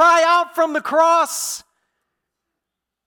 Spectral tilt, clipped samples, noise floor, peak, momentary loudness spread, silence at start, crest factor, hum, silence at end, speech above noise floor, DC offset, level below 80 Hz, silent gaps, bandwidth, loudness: -0.5 dB/octave; under 0.1%; -82 dBFS; -6 dBFS; 11 LU; 0 s; 14 dB; none; 1.45 s; 64 dB; under 0.1%; -66 dBFS; none; 19 kHz; -17 LUFS